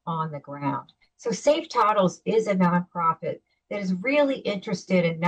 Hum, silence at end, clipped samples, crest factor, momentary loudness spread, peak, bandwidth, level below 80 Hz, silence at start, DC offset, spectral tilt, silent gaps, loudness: none; 0 s; under 0.1%; 14 dB; 11 LU; -10 dBFS; 9 kHz; -68 dBFS; 0.05 s; under 0.1%; -6 dB/octave; none; -25 LUFS